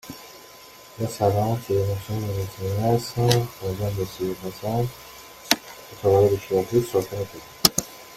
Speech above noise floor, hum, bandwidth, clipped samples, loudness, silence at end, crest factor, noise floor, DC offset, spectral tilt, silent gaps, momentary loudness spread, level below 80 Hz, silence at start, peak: 23 dB; none; 16.5 kHz; under 0.1%; -24 LUFS; 0 s; 24 dB; -46 dBFS; under 0.1%; -4.5 dB/octave; none; 21 LU; -50 dBFS; 0.05 s; 0 dBFS